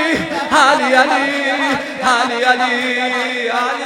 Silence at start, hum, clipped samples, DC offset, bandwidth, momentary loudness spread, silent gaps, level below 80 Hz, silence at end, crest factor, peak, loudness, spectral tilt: 0 s; none; under 0.1%; under 0.1%; 16.5 kHz; 6 LU; none; -56 dBFS; 0 s; 16 dB; 0 dBFS; -14 LUFS; -2.5 dB/octave